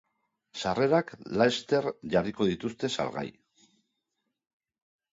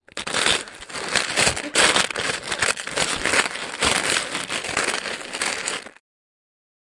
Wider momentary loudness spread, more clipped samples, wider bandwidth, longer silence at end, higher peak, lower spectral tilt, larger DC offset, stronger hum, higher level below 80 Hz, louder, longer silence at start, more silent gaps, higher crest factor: about the same, 9 LU vs 9 LU; neither; second, 7.8 kHz vs 11.5 kHz; first, 1.85 s vs 1.1 s; second, -10 dBFS vs -4 dBFS; first, -5.5 dB/octave vs -0.5 dB/octave; neither; neither; second, -62 dBFS vs -50 dBFS; second, -29 LUFS vs -21 LUFS; first, 0.55 s vs 0.15 s; neither; about the same, 22 dB vs 20 dB